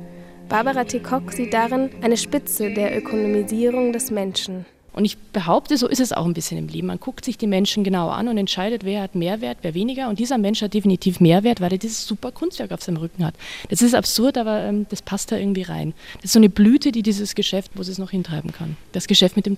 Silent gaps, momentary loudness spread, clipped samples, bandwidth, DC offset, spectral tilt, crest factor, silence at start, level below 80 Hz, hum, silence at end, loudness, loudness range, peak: none; 12 LU; under 0.1%; 16 kHz; under 0.1%; -5 dB/octave; 20 dB; 0 s; -48 dBFS; none; 0 s; -21 LUFS; 4 LU; -2 dBFS